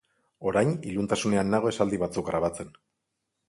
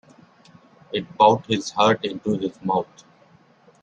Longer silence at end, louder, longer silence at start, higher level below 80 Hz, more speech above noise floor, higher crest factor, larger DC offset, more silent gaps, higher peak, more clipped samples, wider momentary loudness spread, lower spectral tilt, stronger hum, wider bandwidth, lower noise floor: second, 0.8 s vs 1 s; second, -27 LUFS vs -22 LUFS; second, 0.4 s vs 0.9 s; first, -56 dBFS vs -62 dBFS; first, 55 dB vs 34 dB; about the same, 18 dB vs 20 dB; neither; neither; second, -10 dBFS vs -4 dBFS; neither; second, 8 LU vs 13 LU; about the same, -6 dB/octave vs -5 dB/octave; neither; first, 11.5 kHz vs 9.6 kHz; first, -81 dBFS vs -55 dBFS